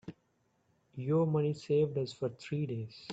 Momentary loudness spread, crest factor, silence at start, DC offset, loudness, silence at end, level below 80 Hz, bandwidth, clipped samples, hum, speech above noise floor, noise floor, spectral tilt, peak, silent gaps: 12 LU; 16 dB; 0.05 s; under 0.1%; -34 LUFS; 0 s; -72 dBFS; 8 kHz; under 0.1%; none; 42 dB; -75 dBFS; -8 dB/octave; -20 dBFS; none